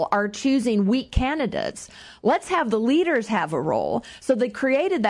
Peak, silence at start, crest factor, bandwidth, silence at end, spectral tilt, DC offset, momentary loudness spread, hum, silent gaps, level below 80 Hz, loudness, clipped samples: -6 dBFS; 0 s; 18 dB; 11.5 kHz; 0 s; -5.5 dB/octave; under 0.1%; 7 LU; none; none; -40 dBFS; -23 LUFS; under 0.1%